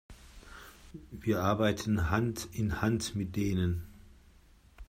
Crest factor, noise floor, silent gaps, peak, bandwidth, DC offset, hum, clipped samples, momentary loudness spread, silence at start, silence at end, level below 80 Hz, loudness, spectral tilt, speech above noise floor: 20 dB; -60 dBFS; none; -12 dBFS; 16 kHz; under 0.1%; none; under 0.1%; 22 LU; 0.1 s; 0.05 s; -50 dBFS; -32 LUFS; -6 dB/octave; 29 dB